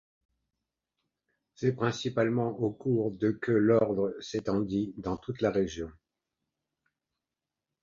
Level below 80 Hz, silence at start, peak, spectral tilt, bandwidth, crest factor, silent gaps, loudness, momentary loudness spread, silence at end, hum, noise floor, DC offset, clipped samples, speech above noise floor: -60 dBFS; 1.6 s; -12 dBFS; -7 dB/octave; 7.6 kHz; 20 dB; none; -30 LUFS; 10 LU; 1.9 s; none; -89 dBFS; under 0.1%; under 0.1%; 61 dB